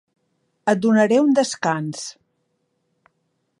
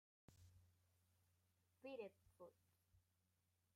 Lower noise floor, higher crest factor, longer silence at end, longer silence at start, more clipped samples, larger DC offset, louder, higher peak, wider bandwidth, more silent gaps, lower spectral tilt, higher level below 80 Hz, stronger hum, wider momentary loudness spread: second, -71 dBFS vs -87 dBFS; about the same, 18 dB vs 22 dB; first, 1.5 s vs 0.75 s; first, 0.65 s vs 0.3 s; neither; neither; first, -19 LUFS vs -60 LUFS; first, -4 dBFS vs -44 dBFS; second, 11.5 kHz vs 15 kHz; neither; about the same, -5 dB/octave vs -5.5 dB/octave; first, -74 dBFS vs -88 dBFS; neither; first, 15 LU vs 11 LU